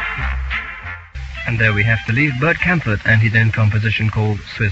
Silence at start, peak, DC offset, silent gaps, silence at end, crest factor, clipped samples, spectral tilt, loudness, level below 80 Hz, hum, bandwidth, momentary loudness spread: 0 s; -2 dBFS; under 0.1%; none; 0 s; 16 dB; under 0.1%; -7 dB/octave; -16 LUFS; -32 dBFS; none; 7.4 kHz; 13 LU